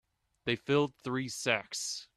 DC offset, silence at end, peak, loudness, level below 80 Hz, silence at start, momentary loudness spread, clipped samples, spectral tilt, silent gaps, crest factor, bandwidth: under 0.1%; 0.15 s; -12 dBFS; -33 LUFS; -70 dBFS; 0.45 s; 6 LU; under 0.1%; -3.5 dB/octave; none; 22 dB; 14 kHz